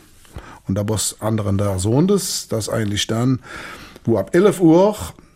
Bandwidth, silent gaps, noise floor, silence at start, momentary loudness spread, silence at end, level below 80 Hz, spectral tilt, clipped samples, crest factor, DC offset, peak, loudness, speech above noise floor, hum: 16 kHz; none; -39 dBFS; 0.35 s; 18 LU; 0.25 s; -46 dBFS; -5.5 dB/octave; under 0.1%; 16 dB; under 0.1%; -2 dBFS; -18 LUFS; 21 dB; none